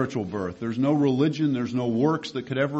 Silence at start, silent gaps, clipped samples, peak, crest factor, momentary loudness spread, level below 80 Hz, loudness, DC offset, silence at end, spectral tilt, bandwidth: 0 s; none; under 0.1%; -10 dBFS; 14 dB; 8 LU; -58 dBFS; -25 LUFS; under 0.1%; 0 s; -7.5 dB/octave; 8.2 kHz